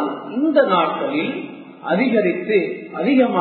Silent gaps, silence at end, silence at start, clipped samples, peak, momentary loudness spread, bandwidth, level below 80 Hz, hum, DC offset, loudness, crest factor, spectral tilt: none; 0 s; 0 s; under 0.1%; -4 dBFS; 11 LU; 4.5 kHz; -72 dBFS; none; under 0.1%; -19 LUFS; 16 dB; -11 dB/octave